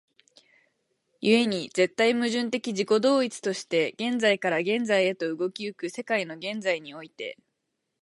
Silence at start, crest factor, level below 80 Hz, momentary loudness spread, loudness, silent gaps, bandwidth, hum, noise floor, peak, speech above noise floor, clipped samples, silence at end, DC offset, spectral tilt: 1.2 s; 20 dB; -78 dBFS; 11 LU; -26 LUFS; none; 11.5 kHz; none; -80 dBFS; -8 dBFS; 54 dB; under 0.1%; 0.7 s; under 0.1%; -4 dB/octave